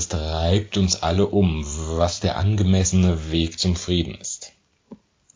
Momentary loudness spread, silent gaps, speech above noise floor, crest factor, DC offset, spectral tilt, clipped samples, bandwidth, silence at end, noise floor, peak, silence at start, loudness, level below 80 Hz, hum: 9 LU; none; 27 dB; 16 dB; under 0.1%; -5 dB/octave; under 0.1%; 7.6 kHz; 0.4 s; -47 dBFS; -4 dBFS; 0 s; -21 LUFS; -30 dBFS; none